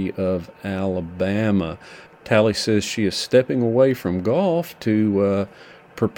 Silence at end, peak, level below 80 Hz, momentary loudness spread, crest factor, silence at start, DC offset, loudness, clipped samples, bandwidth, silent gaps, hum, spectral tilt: 0.05 s; -2 dBFS; -52 dBFS; 10 LU; 18 dB; 0 s; under 0.1%; -21 LUFS; under 0.1%; 18 kHz; none; none; -6 dB/octave